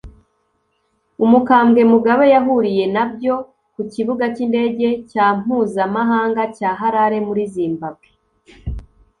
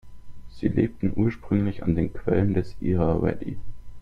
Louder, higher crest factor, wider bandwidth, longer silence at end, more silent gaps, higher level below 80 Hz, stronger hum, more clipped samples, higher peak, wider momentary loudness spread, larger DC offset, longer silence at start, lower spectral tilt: first, -16 LUFS vs -25 LUFS; about the same, 16 dB vs 18 dB; first, 9.8 kHz vs 6.4 kHz; first, 0.4 s vs 0 s; neither; about the same, -42 dBFS vs -40 dBFS; neither; neither; first, -2 dBFS vs -8 dBFS; first, 17 LU vs 6 LU; neither; about the same, 0.05 s vs 0.05 s; second, -7.5 dB/octave vs -10.5 dB/octave